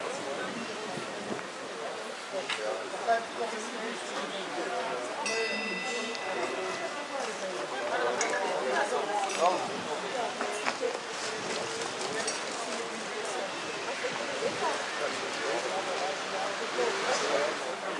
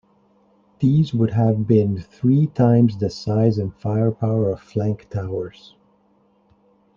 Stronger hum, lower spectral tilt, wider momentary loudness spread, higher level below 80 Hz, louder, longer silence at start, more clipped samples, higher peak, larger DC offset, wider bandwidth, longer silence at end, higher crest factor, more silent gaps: neither; second, -2 dB/octave vs -9.5 dB/octave; second, 6 LU vs 10 LU; second, -82 dBFS vs -54 dBFS; second, -32 LUFS vs -20 LUFS; second, 0 s vs 0.8 s; neither; second, -10 dBFS vs -4 dBFS; neither; first, 11.5 kHz vs 7.2 kHz; second, 0 s vs 1.45 s; first, 22 dB vs 16 dB; neither